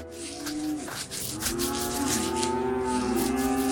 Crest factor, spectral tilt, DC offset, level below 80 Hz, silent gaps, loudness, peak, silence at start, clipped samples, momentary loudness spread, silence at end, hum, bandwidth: 20 dB; -3.5 dB/octave; under 0.1%; -48 dBFS; none; -28 LUFS; -8 dBFS; 0 s; under 0.1%; 7 LU; 0 s; none; 18 kHz